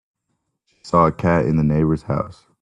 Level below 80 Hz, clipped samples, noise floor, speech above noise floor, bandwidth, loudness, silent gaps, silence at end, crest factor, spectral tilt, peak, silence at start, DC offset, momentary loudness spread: -42 dBFS; under 0.1%; -74 dBFS; 56 dB; 9 kHz; -19 LUFS; none; 0.3 s; 18 dB; -9 dB/octave; -2 dBFS; 0.85 s; under 0.1%; 8 LU